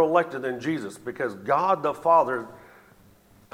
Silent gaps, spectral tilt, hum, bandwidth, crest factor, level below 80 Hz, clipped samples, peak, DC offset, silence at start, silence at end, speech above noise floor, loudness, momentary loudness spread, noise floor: none; -6 dB/octave; none; 16 kHz; 18 dB; -68 dBFS; under 0.1%; -8 dBFS; under 0.1%; 0 s; 0.95 s; 31 dB; -25 LUFS; 11 LU; -56 dBFS